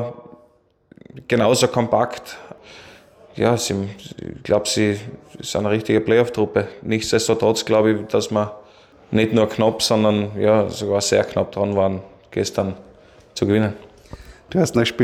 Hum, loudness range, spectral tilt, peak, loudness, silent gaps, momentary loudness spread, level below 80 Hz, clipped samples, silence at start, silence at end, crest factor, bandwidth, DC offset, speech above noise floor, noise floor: none; 4 LU; -5 dB/octave; -4 dBFS; -20 LUFS; none; 16 LU; -54 dBFS; under 0.1%; 0 s; 0 s; 16 dB; 16.5 kHz; under 0.1%; 38 dB; -57 dBFS